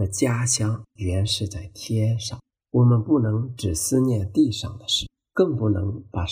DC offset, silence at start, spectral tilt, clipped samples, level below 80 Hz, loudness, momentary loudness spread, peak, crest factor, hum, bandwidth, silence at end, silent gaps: under 0.1%; 0 s; -5 dB/octave; under 0.1%; -44 dBFS; -23 LUFS; 9 LU; -6 dBFS; 16 dB; none; 15.5 kHz; 0 s; none